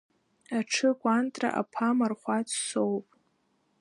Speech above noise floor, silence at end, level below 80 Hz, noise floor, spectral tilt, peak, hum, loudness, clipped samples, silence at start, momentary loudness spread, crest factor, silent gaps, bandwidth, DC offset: 44 dB; 0.8 s; -82 dBFS; -72 dBFS; -3.5 dB/octave; -12 dBFS; none; -29 LUFS; under 0.1%; 0.5 s; 6 LU; 18 dB; none; 11.5 kHz; under 0.1%